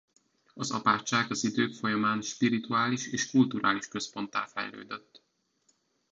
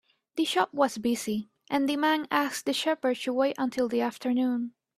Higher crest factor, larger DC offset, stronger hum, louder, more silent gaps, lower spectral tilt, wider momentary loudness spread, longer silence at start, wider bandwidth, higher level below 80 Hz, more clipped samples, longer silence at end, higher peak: about the same, 20 dB vs 20 dB; neither; neither; about the same, -29 LUFS vs -28 LUFS; neither; about the same, -4 dB/octave vs -3.5 dB/octave; first, 11 LU vs 6 LU; first, 0.55 s vs 0.35 s; second, 8 kHz vs 15 kHz; about the same, -72 dBFS vs -70 dBFS; neither; first, 1.15 s vs 0.3 s; about the same, -10 dBFS vs -8 dBFS